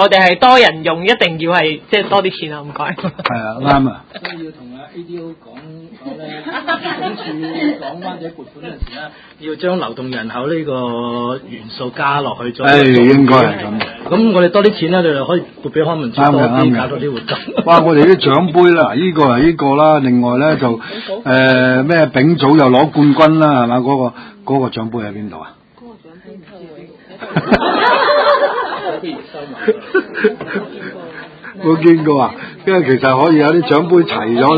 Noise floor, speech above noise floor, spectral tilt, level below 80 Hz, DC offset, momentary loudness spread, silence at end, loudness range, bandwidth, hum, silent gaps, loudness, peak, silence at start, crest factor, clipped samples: -39 dBFS; 27 dB; -7.5 dB/octave; -44 dBFS; under 0.1%; 19 LU; 0 s; 12 LU; 8 kHz; none; none; -12 LUFS; 0 dBFS; 0 s; 14 dB; 0.2%